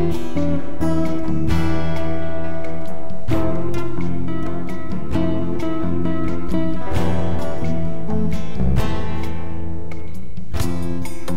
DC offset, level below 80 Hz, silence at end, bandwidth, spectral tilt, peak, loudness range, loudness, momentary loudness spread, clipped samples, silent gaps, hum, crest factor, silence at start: 20%; -32 dBFS; 0 s; 16 kHz; -7.5 dB/octave; -4 dBFS; 2 LU; -24 LUFS; 9 LU; under 0.1%; none; none; 18 dB; 0 s